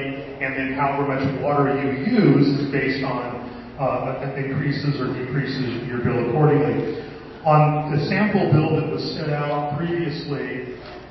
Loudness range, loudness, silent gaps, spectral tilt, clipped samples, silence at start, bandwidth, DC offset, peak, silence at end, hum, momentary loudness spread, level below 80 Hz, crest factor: 4 LU; -22 LUFS; none; -9 dB/octave; under 0.1%; 0 s; 6 kHz; under 0.1%; -2 dBFS; 0 s; none; 11 LU; -50 dBFS; 18 dB